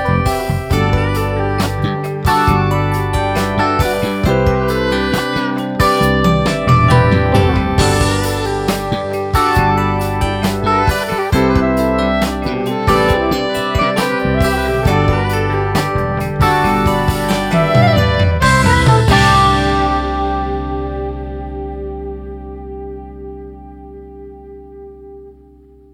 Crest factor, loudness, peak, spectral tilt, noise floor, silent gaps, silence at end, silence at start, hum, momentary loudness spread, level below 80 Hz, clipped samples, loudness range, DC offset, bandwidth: 14 dB; -14 LUFS; 0 dBFS; -6 dB/octave; -43 dBFS; none; 0.6 s; 0 s; none; 17 LU; -26 dBFS; under 0.1%; 14 LU; under 0.1%; 18 kHz